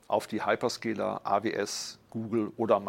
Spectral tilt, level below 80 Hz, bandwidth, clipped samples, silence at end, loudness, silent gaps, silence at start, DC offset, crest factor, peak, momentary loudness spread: -4.5 dB/octave; -72 dBFS; 16.5 kHz; under 0.1%; 0 s; -31 LUFS; none; 0.1 s; under 0.1%; 20 dB; -10 dBFS; 6 LU